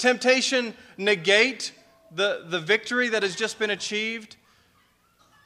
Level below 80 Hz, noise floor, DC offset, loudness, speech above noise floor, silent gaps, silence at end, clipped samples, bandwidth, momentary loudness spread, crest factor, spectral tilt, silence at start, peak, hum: -74 dBFS; -63 dBFS; under 0.1%; -23 LUFS; 39 dB; none; 1.2 s; under 0.1%; 15 kHz; 14 LU; 22 dB; -2.5 dB/octave; 0 s; -4 dBFS; none